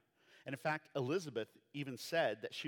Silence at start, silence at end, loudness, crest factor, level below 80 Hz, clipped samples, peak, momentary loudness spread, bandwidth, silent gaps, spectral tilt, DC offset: 0.35 s; 0 s; -41 LUFS; 18 dB; under -90 dBFS; under 0.1%; -22 dBFS; 11 LU; 19 kHz; none; -5 dB/octave; under 0.1%